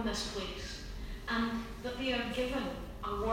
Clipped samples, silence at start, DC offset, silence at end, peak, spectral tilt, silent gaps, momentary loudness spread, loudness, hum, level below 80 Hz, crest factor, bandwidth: under 0.1%; 0 s; under 0.1%; 0 s; -18 dBFS; -4 dB/octave; none; 9 LU; -37 LUFS; none; -46 dBFS; 18 dB; 16 kHz